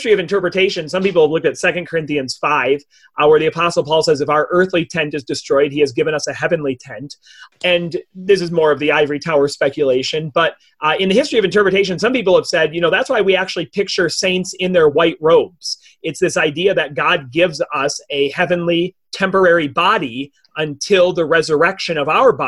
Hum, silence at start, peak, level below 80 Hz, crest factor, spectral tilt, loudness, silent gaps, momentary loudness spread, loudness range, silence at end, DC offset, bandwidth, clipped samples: none; 0 s; -2 dBFS; -54 dBFS; 14 dB; -4.5 dB/octave; -16 LUFS; none; 8 LU; 3 LU; 0 s; under 0.1%; 12 kHz; under 0.1%